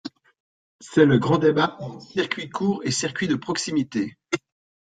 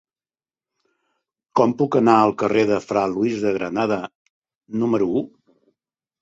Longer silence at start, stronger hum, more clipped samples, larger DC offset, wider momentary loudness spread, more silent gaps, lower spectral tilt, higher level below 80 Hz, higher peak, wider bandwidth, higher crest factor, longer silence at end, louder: second, 0.05 s vs 1.55 s; neither; neither; neither; about the same, 13 LU vs 11 LU; first, 0.40-0.79 s vs 4.15-4.42 s, 4.55-4.61 s; second, -5 dB/octave vs -7 dB/octave; about the same, -62 dBFS vs -60 dBFS; about the same, -4 dBFS vs -2 dBFS; first, 9.4 kHz vs 8 kHz; about the same, 20 dB vs 20 dB; second, 0.45 s vs 0.95 s; second, -23 LUFS vs -20 LUFS